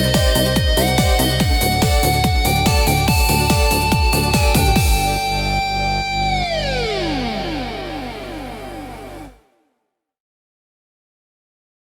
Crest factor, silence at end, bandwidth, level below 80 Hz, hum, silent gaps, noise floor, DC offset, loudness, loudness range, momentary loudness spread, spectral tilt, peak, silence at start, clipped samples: 16 dB; 2.6 s; 18.5 kHz; -24 dBFS; 50 Hz at -35 dBFS; none; -74 dBFS; under 0.1%; -17 LUFS; 16 LU; 15 LU; -4.5 dB/octave; -2 dBFS; 0 s; under 0.1%